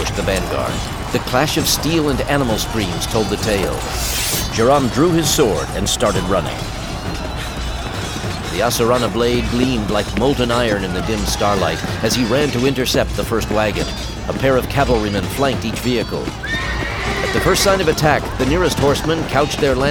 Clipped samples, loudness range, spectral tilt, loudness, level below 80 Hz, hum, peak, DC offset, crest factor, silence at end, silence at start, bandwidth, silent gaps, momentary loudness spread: under 0.1%; 3 LU; -4.5 dB/octave; -17 LUFS; -28 dBFS; none; -2 dBFS; under 0.1%; 16 dB; 0 s; 0 s; over 20 kHz; none; 9 LU